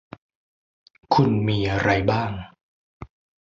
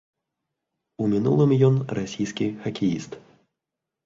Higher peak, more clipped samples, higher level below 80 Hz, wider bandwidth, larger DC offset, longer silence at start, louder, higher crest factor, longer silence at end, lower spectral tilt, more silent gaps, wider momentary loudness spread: about the same, -4 dBFS vs -6 dBFS; neither; first, -44 dBFS vs -58 dBFS; about the same, 7.4 kHz vs 7.6 kHz; neither; about the same, 1.1 s vs 1 s; about the same, -22 LUFS vs -23 LUFS; about the same, 20 dB vs 18 dB; second, 0.35 s vs 0.85 s; about the same, -7 dB/octave vs -7.5 dB/octave; first, 2.63-3.00 s vs none; second, 9 LU vs 13 LU